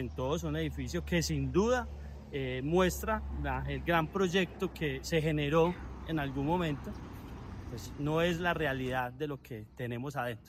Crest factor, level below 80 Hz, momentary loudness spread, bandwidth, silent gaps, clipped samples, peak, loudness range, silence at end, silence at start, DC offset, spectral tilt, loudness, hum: 18 dB; -46 dBFS; 14 LU; 16 kHz; none; under 0.1%; -14 dBFS; 3 LU; 0 s; 0 s; under 0.1%; -5.5 dB/octave; -33 LUFS; none